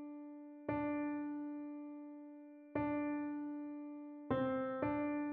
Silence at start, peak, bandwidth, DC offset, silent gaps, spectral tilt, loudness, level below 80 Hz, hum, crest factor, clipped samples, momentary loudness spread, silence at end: 0 s; -24 dBFS; 3.8 kHz; under 0.1%; none; -6.5 dB/octave; -42 LUFS; -70 dBFS; none; 18 dB; under 0.1%; 13 LU; 0 s